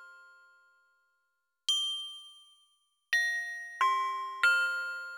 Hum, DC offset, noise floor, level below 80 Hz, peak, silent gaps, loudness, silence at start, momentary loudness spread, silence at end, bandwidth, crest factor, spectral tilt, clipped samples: none; under 0.1%; -81 dBFS; -82 dBFS; -12 dBFS; none; -30 LUFS; 0 s; 12 LU; 0 s; over 20 kHz; 22 dB; 3.5 dB/octave; under 0.1%